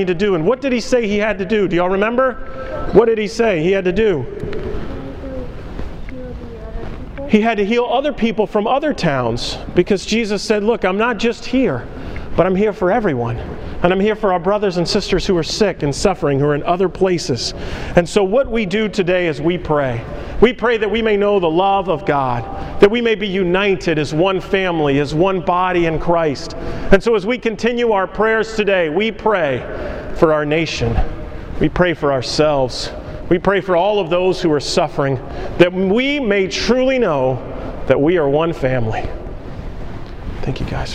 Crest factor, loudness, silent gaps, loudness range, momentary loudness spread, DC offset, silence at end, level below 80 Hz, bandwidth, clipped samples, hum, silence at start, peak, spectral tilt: 16 dB; -17 LUFS; none; 3 LU; 14 LU; under 0.1%; 0 s; -32 dBFS; 11 kHz; under 0.1%; none; 0 s; 0 dBFS; -5.5 dB/octave